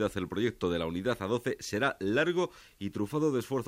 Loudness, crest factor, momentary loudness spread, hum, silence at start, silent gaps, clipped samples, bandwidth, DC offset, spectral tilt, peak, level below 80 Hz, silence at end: -31 LUFS; 16 dB; 7 LU; none; 0 s; none; under 0.1%; 16 kHz; under 0.1%; -5.5 dB/octave; -14 dBFS; -58 dBFS; 0 s